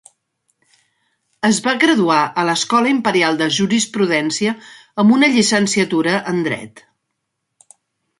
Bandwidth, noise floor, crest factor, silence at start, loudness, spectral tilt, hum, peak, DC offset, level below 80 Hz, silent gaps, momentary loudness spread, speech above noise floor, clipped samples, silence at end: 11.5 kHz; -75 dBFS; 16 dB; 1.45 s; -16 LUFS; -3.5 dB/octave; none; -2 dBFS; under 0.1%; -62 dBFS; none; 8 LU; 59 dB; under 0.1%; 1.4 s